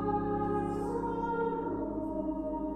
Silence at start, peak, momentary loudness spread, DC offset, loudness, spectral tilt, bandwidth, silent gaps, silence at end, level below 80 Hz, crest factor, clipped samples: 0 s; -20 dBFS; 3 LU; under 0.1%; -34 LUFS; -9 dB/octave; 11.5 kHz; none; 0 s; -50 dBFS; 12 dB; under 0.1%